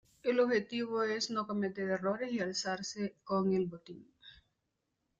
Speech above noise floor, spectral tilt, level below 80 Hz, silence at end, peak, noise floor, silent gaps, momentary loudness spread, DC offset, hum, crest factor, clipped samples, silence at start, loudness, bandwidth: 50 dB; -4.5 dB/octave; -74 dBFS; 0.85 s; -18 dBFS; -84 dBFS; none; 9 LU; under 0.1%; none; 18 dB; under 0.1%; 0.25 s; -34 LUFS; 9.2 kHz